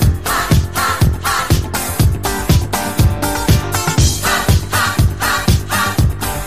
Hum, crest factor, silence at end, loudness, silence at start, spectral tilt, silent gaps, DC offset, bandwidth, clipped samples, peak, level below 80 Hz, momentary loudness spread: none; 14 dB; 0 s; -15 LUFS; 0 s; -4.5 dB/octave; none; 2%; 15.5 kHz; under 0.1%; -2 dBFS; -22 dBFS; 3 LU